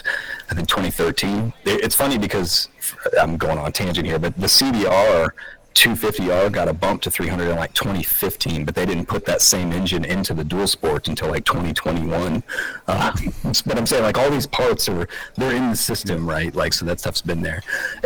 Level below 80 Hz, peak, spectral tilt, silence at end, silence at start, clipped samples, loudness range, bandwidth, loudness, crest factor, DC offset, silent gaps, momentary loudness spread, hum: -38 dBFS; -2 dBFS; -3.5 dB/octave; 0 s; 0 s; under 0.1%; 4 LU; over 20 kHz; -19 LUFS; 18 dB; 0.6%; none; 9 LU; none